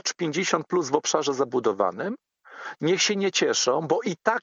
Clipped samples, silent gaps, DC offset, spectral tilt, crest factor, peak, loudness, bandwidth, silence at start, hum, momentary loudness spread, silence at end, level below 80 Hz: under 0.1%; none; under 0.1%; -3 dB/octave; 20 dB; -6 dBFS; -24 LUFS; 7.8 kHz; 0.05 s; none; 11 LU; 0.05 s; -80 dBFS